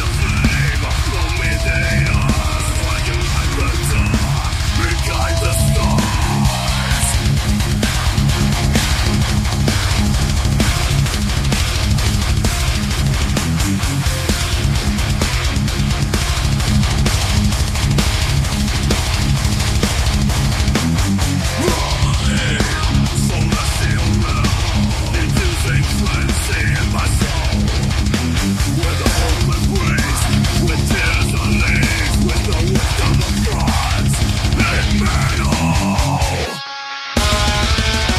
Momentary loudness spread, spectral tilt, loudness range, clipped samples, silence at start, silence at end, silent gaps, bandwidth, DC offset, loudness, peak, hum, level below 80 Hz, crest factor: 2 LU; -4.5 dB/octave; 1 LU; under 0.1%; 0 s; 0 s; none; 15.5 kHz; under 0.1%; -16 LUFS; 0 dBFS; none; -20 dBFS; 16 dB